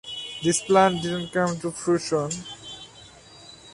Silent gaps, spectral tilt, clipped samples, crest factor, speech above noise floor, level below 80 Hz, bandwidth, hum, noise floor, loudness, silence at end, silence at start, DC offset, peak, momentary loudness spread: none; -4 dB/octave; under 0.1%; 22 dB; 25 dB; -58 dBFS; 11.5 kHz; none; -48 dBFS; -24 LUFS; 0 s; 0.05 s; under 0.1%; -4 dBFS; 21 LU